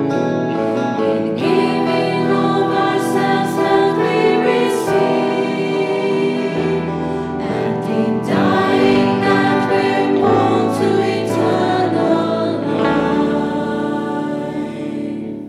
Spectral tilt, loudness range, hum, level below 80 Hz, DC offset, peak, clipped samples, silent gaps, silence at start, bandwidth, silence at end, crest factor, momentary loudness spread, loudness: -6.5 dB/octave; 3 LU; none; -50 dBFS; under 0.1%; -4 dBFS; under 0.1%; none; 0 s; 14.5 kHz; 0 s; 12 dB; 7 LU; -16 LUFS